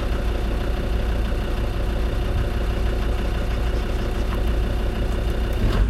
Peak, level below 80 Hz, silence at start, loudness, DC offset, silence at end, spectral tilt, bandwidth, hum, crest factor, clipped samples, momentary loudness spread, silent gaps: -8 dBFS; -22 dBFS; 0 s; -25 LUFS; under 0.1%; 0 s; -6.5 dB/octave; 13 kHz; none; 14 dB; under 0.1%; 1 LU; none